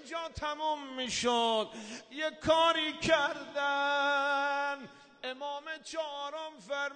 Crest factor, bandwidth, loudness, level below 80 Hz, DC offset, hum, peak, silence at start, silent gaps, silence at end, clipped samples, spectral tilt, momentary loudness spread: 20 dB; 9.6 kHz; -32 LUFS; -62 dBFS; under 0.1%; none; -14 dBFS; 0 s; none; 0 s; under 0.1%; -2.5 dB/octave; 13 LU